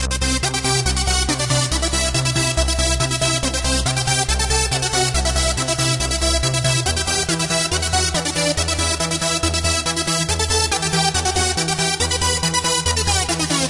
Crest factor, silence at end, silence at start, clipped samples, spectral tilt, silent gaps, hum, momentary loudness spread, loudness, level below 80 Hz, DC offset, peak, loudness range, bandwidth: 16 dB; 0 s; 0 s; under 0.1%; -2.5 dB/octave; none; none; 1 LU; -18 LUFS; -28 dBFS; under 0.1%; -2 dBFS; 1 LU; 11.5 kHz